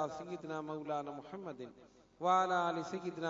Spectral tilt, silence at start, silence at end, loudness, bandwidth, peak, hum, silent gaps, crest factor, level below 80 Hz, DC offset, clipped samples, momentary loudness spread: -4 dB/octave; 0 s; 0 s; -38 LUFS; 7.4 kHz; -18 dBFS; none; none; 20 dB; -78 dBFS; under 0.1%; under 0.1%; 16 LU